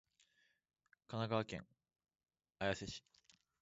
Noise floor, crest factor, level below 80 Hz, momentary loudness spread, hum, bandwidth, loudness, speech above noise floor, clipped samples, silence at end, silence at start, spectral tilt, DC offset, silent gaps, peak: -79 dBFS; 24 dB; -70 dBFS; 11 LU; none; 7.6 kHz; -44 LUFS; 36 dB; under 0.1%; 0.6 s; 1.1 s; -4 dB/octave; under 0.1%; none; -24 dBFS